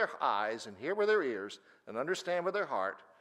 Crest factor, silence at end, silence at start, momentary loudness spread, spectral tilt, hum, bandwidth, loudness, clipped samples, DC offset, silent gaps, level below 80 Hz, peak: 16 dB; 0.2 s; 0 s; 12 LU; -4 dB/octave; none; 12.5 kHz; -34 LUFS; under 0.1%; under 0.1%; none; -90 dBFS; -18 dBFS